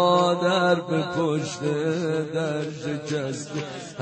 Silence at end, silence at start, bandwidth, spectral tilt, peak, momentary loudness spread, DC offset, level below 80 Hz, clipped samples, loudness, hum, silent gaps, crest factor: 0 s; 0 s; 8.8 kHz; -5.5 dB/octave; -8 dBFS; 11 LU; under 0.1%; -66 dBFS; under 0.1%; -25 LUFS; none; none; 16 dB